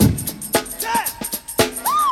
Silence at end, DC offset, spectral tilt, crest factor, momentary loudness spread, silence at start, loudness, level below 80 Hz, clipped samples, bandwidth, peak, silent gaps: 0 s; under 0.1%; -4 dB/octave; 20 dB; 6 LU; 0 s; -21 LUFS; -38 dBFS; under 0.1%; over 20 kHz; 0 dBFS; none